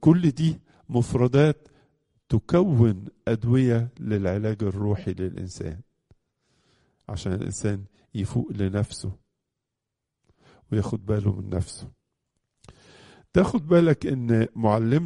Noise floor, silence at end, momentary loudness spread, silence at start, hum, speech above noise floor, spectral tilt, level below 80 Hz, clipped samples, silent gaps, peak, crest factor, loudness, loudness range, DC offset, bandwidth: -84 dBFS; 0 s; 15 LU; 0 s; none; 61 dB; -8 dB/octave; -48 dBFS; under 0.1%; none; -6 dBFS; 20 dB; -25 LUFS; 8 LU; under 0.1%; 11 kHz